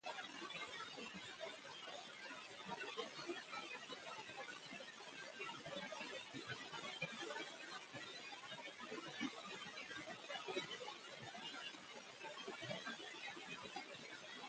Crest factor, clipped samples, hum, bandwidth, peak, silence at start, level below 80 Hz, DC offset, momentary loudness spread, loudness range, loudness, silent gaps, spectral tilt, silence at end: 22 dB; under 0.1%; none; 9 kHz; -30 dBFS; 0.05 s; -88 dBFS; under 0.1%; 5 LU; 1 LU; -50 LUFS; none; -2.5 dB/octave; 0 s